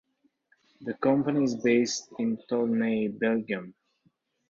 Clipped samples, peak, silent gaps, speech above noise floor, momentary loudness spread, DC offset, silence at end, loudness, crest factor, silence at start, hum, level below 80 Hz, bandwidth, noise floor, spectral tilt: under 0.1%; -12 dBFS; none; 44 dB; 11 LU; under 0.1%; 0.8 s; -27 LUFS; 16 dB; 0.8 s; none; -70 dBFS; 7.6 kHz; -70 dBFS; -5 dB/octave